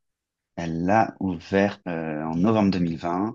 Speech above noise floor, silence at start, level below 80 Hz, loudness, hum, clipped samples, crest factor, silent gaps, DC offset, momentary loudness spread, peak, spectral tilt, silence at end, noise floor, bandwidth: 59 dB; 0.55 s; -60 dBFS; -24 LUFS; none; under 0.1%; 18 dB; none; under 0.1%; 10 LU; -6 dBFS; -7.5 dB/octave; 0 s; -82 dBFS; 7.2 kHz